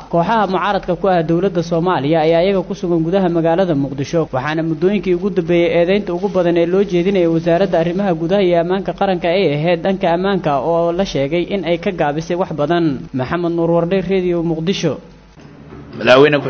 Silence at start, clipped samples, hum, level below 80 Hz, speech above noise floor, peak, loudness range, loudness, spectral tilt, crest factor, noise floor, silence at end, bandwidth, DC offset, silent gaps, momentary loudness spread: 0 s; under 0.1%; none; -42 dBFS; 24 dB; 0 dBFS; 2 LU; -16 LUFS; -7 dB/octave; 16 dB; -39 dBFS; 0 s; 6.8 kHz; under 0.1%; none; 5 LU